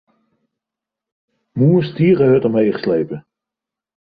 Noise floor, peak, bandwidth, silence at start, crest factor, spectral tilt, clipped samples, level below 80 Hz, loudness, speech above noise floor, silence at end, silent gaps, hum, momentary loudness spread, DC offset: -86 dBFS; -4 dBFS; 5 kHz; 1.55 s; 14 dB; -11.5 dB/octave; under 0.1%; -56 dBFS; -15 LUFS; 72 dB; 0.85 s; none; none; 14 LU; under 0.1%